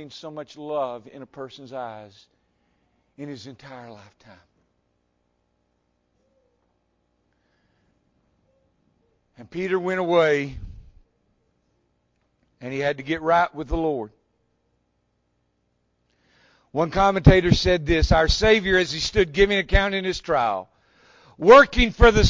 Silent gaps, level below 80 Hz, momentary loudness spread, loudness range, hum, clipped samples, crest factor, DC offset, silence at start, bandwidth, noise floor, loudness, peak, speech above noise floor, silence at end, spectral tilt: none; -34 dBFS; 23 LU; 22 LU; 60 Hz at -55 dBFS; under 0.1%; 22 dB; under 0.1%; 0 s; 7.6 kHz; -71 dBFS; -20 LUFS; -2 dBFS; 50 dB; 0 s; -5.5 dB/octave